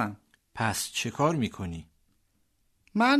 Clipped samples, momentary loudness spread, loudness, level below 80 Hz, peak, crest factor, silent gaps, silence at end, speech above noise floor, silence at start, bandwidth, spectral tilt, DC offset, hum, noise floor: under 0.1%; 17 LU; -30 LUFS; -58 dBFS; -10 dBFS; 20 dB; none; 0 s; 41 dB; 0 s; 13.5 kHz; -4.5 dB/octave; under 0.1%; none; -70 dBFS